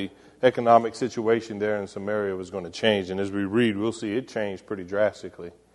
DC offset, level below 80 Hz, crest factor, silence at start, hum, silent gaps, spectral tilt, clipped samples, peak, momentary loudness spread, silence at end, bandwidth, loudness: under 0.1%; -64 dBFS; 20 dB; 0 s; none; none; -5.5 dB/octave; under 0.1%; -4 dBFS; 14 LU; 0.25 s; 11.5 kHz; -25 LUFS